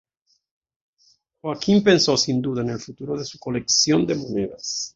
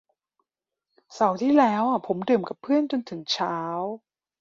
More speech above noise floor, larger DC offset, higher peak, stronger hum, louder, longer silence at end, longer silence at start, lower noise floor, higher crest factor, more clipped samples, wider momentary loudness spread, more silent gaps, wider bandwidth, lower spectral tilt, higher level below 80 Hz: second, 41 dB vs 62 dB; neither; about the same, -4 dBFS vs -6 dBFS; neither; first, -21 LUFS vs -24 LUFS; second, 0.05 s vs 0.45 s; first, 1.45 s vs 1.1 s; second, -62 dBFS vs -86 dBFS; about the same, 18 dB vs 20 dB; neither; first, 13 LU vs 10 LU; neither; about the same, 7.8 kHz vs 7.6 kHz; second, -4 dB/octave vs -5.5 dB/octave; first, -56 dBFS vs -72 dBFS